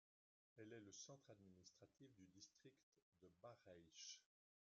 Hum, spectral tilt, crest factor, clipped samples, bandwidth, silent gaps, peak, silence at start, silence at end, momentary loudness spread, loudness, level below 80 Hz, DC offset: none; -3.5 dB/octave; 20 dB; under 0.1%; 7.4 kHz; 2.83-2.92 s, 3.02-3.12 s; -48 dBFS; 0.55 s; 0.35 s; 9 LU; -64 LUFS; under -90 dBFS; under 0.1%